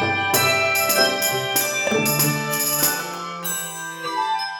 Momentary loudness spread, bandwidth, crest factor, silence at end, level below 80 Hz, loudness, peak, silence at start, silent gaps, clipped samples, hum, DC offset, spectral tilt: 10 LU; 18 kHz; 18 dB; 0 s; -60 dBFS; -19 LUFS; -4 dBFS; 0 s; none; under 0.1%; none; under 0.1%; -2 dB/octave